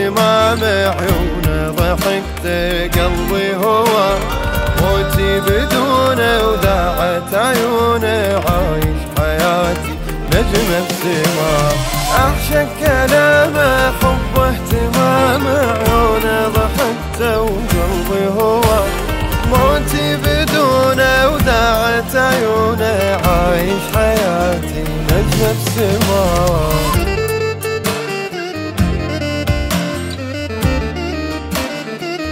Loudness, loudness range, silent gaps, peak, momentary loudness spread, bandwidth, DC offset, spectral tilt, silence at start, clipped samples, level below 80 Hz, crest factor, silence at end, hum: -15 LUFS; 4 LU; none; 0 dBFS; 7 LU; 16.5 kHz; under 0.1%; -5 dB/octave; 0 s; under 0.1%; -24 dBFS; 14 dB; 0 s; none